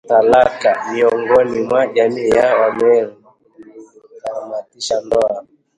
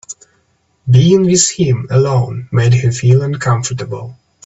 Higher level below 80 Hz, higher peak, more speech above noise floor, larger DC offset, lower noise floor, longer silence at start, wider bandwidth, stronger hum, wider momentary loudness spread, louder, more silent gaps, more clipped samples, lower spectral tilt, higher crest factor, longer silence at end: second, -52 dBFS vs -44 dBFS; about the same, 0 dBFS vs 0 dBFS; second, 29 dB vs 47 dB; neither; second, -43 dBFS vs -59 dBFS; about the same, 0.1 s vs 0.1 s; first, 11 kHz vs 8.2 kHz; neither; second, 15 LU vs 18 LU; second, -15 LUFS vs -12 LUFS; neither; neither; about the same, -4.5 dB/octave vs -5.5 dB/octave; about the same, 16 dB vs 14 dB; about the same, 0.35 s vs 0.35 s